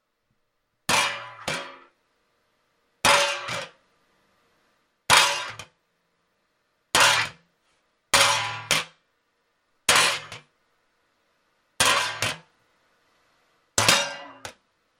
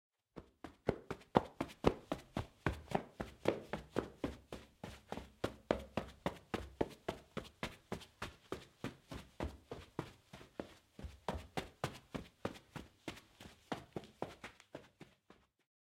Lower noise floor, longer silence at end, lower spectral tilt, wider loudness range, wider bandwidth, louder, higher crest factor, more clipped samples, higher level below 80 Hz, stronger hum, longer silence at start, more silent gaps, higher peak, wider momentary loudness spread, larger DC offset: first, -74 dBFS vs -69 dBFS; about the same, 0.5 s vs 0.5 s; second, -0.5 dB/octave vs -6 dB/octave; second, 4 LU vs 9 LU; about the same, 16.5 kHz vs 16.5 kHz; first, -21 LUFS vs -45 LUFS; second, 26 dB vs 34 dB; neither; about the same, -60 dBFS vs -58 dBFS; neither; first, 0.9 s vs 0.35 s; neither; first, 0 dBFS vs -10 dBFS; first, 23 LU vs 17 LU; neither